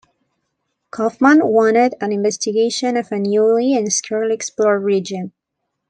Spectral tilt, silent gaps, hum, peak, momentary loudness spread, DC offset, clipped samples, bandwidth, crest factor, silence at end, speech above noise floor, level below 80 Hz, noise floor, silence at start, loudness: -4 dB/octave; none; none; -2 dBFS; 10 LU; under 0.1%; under 0.1%; 10 kHz; 16 dB; 0.6 s; 60 dB; -66 dBFS; -76 dBFS; 0.95 s; -16 LUFS